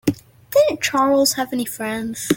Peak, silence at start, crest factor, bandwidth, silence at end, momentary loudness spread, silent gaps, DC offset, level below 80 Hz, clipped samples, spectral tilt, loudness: -2 dBFS; 0.05 s; 16 dB; 17 kHz; 0 s; 9 LU; none; under 0.1%; -54 dBFS; under 0.1%; -3.5 dB/octave; -19 LUFS